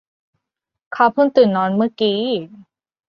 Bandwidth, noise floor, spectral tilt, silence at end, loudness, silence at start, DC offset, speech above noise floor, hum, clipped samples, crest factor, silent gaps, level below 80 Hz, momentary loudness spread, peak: 6 kHz; -81 dBFS; -8 dB/octave; 0.55 s; -17 LUFS; 0.9 s; under 0.1%; 65 dB; none; under 0.1%; 18 dB; none; -64 dBFS; 10 LU; 0 dBFS